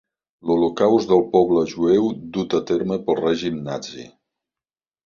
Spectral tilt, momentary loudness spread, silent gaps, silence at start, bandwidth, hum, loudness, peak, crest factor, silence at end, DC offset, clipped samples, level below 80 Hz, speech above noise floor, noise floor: -6.5 dB/octave; 12 LU; none; 0.45 s; 7.2 kHz; none; -20 LUFS; -2 dBFS; 18 dB; 1 s; under 0.1%; under 0.1%; -56 dBFS; over 71 dB; under -90 dBFS